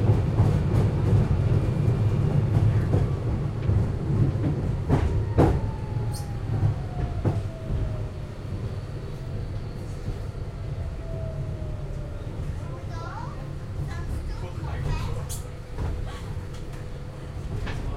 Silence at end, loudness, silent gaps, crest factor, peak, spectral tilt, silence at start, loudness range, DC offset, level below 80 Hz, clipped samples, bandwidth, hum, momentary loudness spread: 0 s; -28 LUFS; none; 20 dB; -6 dBFS; -8 dB/octave; 0 s; 10 LU; under 0.1%; -34 dBFS; under 0.1%; 13 kHz; none; 13 LU